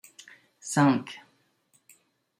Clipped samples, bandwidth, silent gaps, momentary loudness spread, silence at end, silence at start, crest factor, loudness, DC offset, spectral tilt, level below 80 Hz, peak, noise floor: under 0.1%; 15.5 kHz; none; 26 LU; 1.2 s; 0.65 s; 20 dB; -25 LUFS; under 0.1%; -5.5 dB/octave; -78 dBFS; -10 dBFS; -68 dBFS